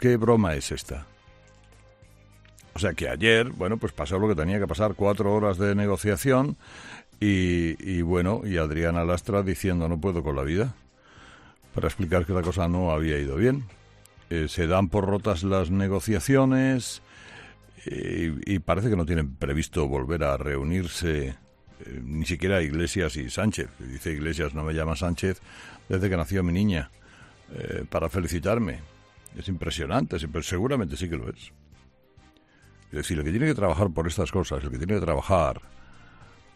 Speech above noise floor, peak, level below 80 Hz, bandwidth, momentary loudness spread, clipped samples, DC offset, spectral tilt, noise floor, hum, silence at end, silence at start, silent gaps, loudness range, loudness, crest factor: 31 dB; -6 dBFS; -42 dBFS; 14 kHz; 13 LU; under 0.1%; under 0.1%; -6 dB/octave; -56 dBFS; none; 0.3 s; 0 s; none; 5 LU; -26 LUFS; 20 dB